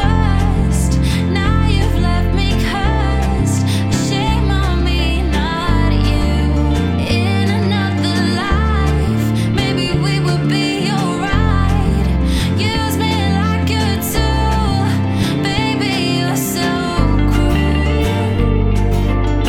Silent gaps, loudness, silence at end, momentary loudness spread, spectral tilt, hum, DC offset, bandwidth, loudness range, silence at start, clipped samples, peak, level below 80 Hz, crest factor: none; -16 LUFS; 0 s; 2 LU; -6 dB/octave; none; under 0.1%; 16.5 kHz; 0 LU; 0 s; under 0.1%; 0 dBFS; -20 dBFS; 14 dB